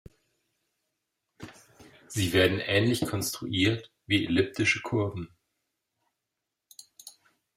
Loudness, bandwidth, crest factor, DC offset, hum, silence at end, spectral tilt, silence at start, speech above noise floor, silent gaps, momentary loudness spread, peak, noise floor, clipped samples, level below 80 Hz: -27 LUFS; 16 kHz; 22 dB; under 0.1%; none; 0.45 s; -4.5 dB/octave; 1.4 s; 59 dB; none; 24 LU; -8 dBFS; -85 dBFS; under 0.1%; -62 dBFS